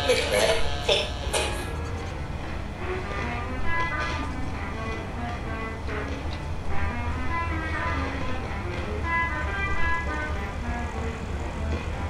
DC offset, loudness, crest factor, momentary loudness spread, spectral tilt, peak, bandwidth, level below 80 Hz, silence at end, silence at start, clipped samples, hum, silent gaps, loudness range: under 0.1%; -29 LUFS; 20 dB; 9 LU; -4.5 dB/octave; -8 dBFS; 14 kHz; -34 dBFS; 0 s; 0 s; under 0.1%; none; none; 3 LU